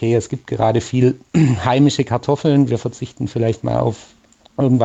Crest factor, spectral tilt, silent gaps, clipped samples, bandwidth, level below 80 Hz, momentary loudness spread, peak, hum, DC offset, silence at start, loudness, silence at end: 14 dB; -7 dB/octave; none; under 0.1%; 8.4 kHz; -48 dBFS; 10 LU; -2 dBFS; none; under 0.1%; 0 s; -18 LUFS; 0 s